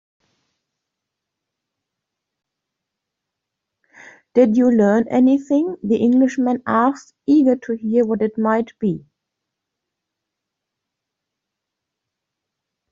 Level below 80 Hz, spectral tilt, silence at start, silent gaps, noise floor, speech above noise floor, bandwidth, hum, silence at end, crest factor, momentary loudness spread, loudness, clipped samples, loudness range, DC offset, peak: -64 dBFS; -7 dB/octave; 4.35 s; none; -82 dBFS; 65 dB; 7.4 kHz; none; 3.9 s; 18 dB; 8 LU; -17 LUFS; under 0.1%; 10 LU; under 0.1%; -4 dBFS